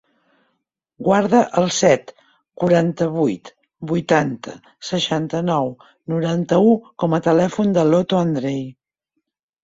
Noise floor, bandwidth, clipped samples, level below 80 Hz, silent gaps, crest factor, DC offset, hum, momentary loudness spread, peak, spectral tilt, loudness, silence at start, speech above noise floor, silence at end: -76 dBFS; 7.8 kHz; under 0.1%; -58 dBFS; none; 18 dB; under 0.1%; none; 12 LU; -2 dBFS; -6 dB/octave; -18 LUFS; 1 s; 58 dB; 0.9 s